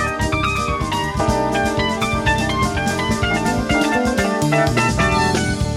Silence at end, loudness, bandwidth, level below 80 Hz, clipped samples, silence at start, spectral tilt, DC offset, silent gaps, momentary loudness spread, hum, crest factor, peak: 0 s; -18 LUFS; 16 kHz; -30 dBFS; under 0.1%; 0 s; -5 dB/octave; under 0.1%; none; 3 LU; none; 16 dB; -2 dBFS